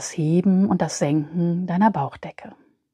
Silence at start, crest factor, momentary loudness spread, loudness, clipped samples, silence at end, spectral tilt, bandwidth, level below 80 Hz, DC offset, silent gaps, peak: 0 s; 16 dB; 11 LU; -21 LUFS; under 0.1%; 0.4 s; -6.5 dB/octave; 11 kHz; -60 dBFS; under 0.1%; none; -6 dBFS